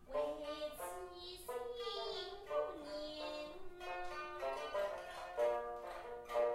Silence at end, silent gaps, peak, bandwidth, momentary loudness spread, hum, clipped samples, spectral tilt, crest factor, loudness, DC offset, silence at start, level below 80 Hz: 0 s; none; -26 dBFS; 16 kHz; 10 LU; none; under 0.1%; -3 dB/octave; 16 dB; -44 LUFS; under 0.1%; 0 s; -64 dBFS